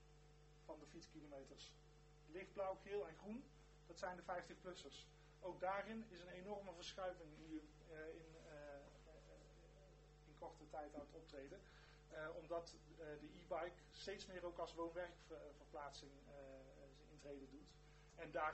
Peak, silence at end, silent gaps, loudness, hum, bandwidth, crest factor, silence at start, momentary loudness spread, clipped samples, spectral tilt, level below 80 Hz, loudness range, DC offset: -32 dBFS; 0 s; none; -54 LUFS; 50 Hz at -70 dBFS; 8.2 kHz; 22 dB; 0 s; 17 LU; under 0.1%; -4.5 dB/octave; -70 dBFS; 8 LU; under 0.1%